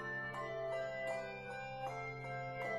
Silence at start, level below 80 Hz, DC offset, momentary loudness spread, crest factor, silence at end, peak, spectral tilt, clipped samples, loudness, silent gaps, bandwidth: 0 s; -68 dBFS; under 0.1%; 4 LU; 12 dB; 0 s; -30 dBFS; -5.5 dB/octave; under 0.1%; -43 LUFS; none; 13.5 kHz